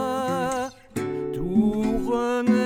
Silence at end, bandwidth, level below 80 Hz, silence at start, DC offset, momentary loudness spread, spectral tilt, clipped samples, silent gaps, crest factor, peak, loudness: 0 s; 15 kHz; -44 dBFS; 0 s; under 0.1%; 8 LU; -6 dB/octave; under 0.1%; none; 16 dB; -8 dBFS; -25 LUFS